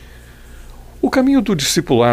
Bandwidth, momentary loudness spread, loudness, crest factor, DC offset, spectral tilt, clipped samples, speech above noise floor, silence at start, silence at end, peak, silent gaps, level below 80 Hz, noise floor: 16 kHz; 4 LU; -15 LUFS; 14 dB; under 0.1%; -4.5 dB/octave; under 0.1%; 25 dB; 0 s; 0 s; -2 dBFS; none; -38 dBFS; -39 dBFS